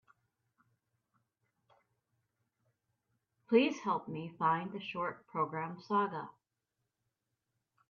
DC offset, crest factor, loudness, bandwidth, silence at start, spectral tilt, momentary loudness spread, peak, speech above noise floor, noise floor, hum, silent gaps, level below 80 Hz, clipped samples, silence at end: under 0.1%; 24 dB; -35 LUFS; 7.2 kHz; 3.5 s; -4.5 dB/octave; 12 LU; -16 dBFS; 53 dB; -87 dBFS; none; none; -82 dBFS; under 0.1%; 1.6 s